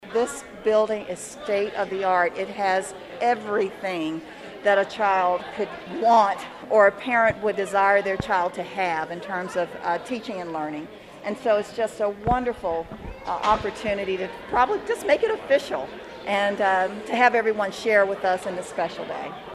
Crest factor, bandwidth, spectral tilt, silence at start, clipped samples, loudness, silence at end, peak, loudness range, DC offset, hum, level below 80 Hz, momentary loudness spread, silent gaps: 20 dB; 13 kHz; -4.5 dB/octave; 0 s; under 0.1%; -24 LUFS; 0 s; -4 dBFS; 6 LU; under 0.1%; none; -52 dBFS; 12 LU; none